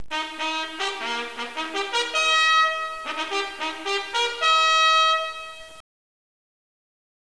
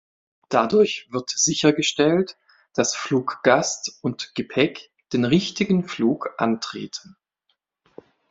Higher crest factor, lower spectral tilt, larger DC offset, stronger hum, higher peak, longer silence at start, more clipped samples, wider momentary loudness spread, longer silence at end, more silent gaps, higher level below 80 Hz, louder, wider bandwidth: second, 14 dB vs 22 dB; second, 1 dB/octave vs -4 dB/octave; first, 0.4% vs under 0.1%; neither; second, -10 dBFS vs -2 dBFS; second, 0 s vs 0.5 s; neither; about the same, 13 LU vs 11 LU; about the same, 1.4 s vs 1.3 s; neither; about the same, -62 dBFS vs -62 dBFS; about the same, -22 LUFS vs -22 LUFS; first, 11 kHz vs 8 kHz